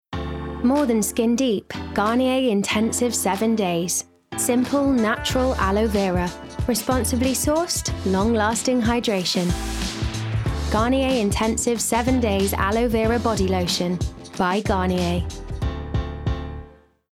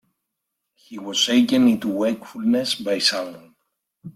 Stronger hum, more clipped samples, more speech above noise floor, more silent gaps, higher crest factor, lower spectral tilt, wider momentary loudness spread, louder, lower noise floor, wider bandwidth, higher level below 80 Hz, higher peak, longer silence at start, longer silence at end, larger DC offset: neither; neither; second, 24 dB vs 59 dB; neither; second, 12 dB vs 18 dB; about the same, -4.5 dB/octave vs -3.5 dB/octave; second, 8 LU vs 15 LU; about the same, -22 LUFS vs -20 LUFS; second, -45 dBFS vs -80 dBFS; first, 17 kHz vs 15 kHz; first, -34 dBFS vs -64 dBFS; second, -10 dBFS vs -4 dBFS; second, 0.1 s vs 0.9 s; first, 0.4 s vs 0.05 s; neither